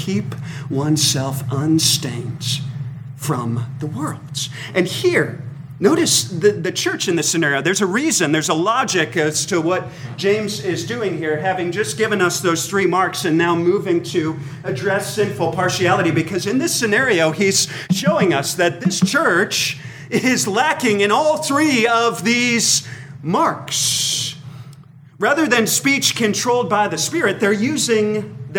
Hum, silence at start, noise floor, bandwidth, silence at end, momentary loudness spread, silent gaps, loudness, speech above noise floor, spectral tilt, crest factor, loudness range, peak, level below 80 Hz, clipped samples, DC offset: none; 0 s; -42 dBFS; 19 kHz; 0 s; 10 LU; none; -17 LUFS; 24 dB; -3.5 dB/octave; 16 dB; 3 LU; -2 dBFS; -58 dBFS; under 0.1%; under 0.1%